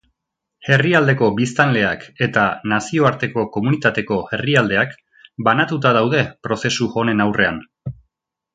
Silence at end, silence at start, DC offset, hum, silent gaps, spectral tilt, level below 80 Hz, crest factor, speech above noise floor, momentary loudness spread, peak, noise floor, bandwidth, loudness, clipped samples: 0.6 s; 0.6 s; under 0.1%; none; none; -5.5 dB/octave; -52 dBFS; 18 dB; 62 dB; 8 LU; 0 dBFS; -79 dBFS; 9.2 kHz; -17 LUFS; under 0.1%